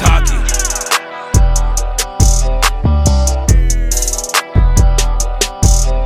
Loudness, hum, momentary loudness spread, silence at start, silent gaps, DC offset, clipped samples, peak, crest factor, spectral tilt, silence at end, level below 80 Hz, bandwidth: -14 LUFS; none; 4 LU; 0 s; none; under 0.1%; 0.2%; 0 dBFS; 12 dB; -3.5 dB/octave; 0 s; -12 dBFS; 15.5 kHz